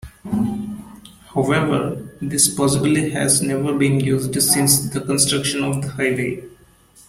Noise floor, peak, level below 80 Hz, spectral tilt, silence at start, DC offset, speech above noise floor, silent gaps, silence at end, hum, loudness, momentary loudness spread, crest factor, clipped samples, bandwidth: -50 dBFS; 0 dBFS; -48 dBFS; -4 dB/octave; 0.05 s; under 0.1%; 31 dB; none; 0.6 s; none; -18 LUFS; 12 LU; 20 dB; under 0.1%; 16.5 kHz